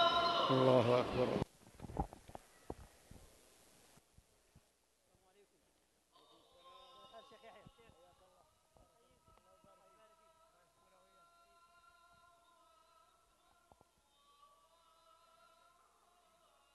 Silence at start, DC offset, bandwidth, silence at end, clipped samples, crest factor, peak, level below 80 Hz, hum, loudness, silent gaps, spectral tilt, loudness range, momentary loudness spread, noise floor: 0 s; under 0.1%; 12 kHz; 9.25 s; under 0.1%; 26 dB; -18 dBFS; -64 dBFS; none; -35 LUFS; none; -6 dB/octave; 30 LU; 31 LU; -77 dBFS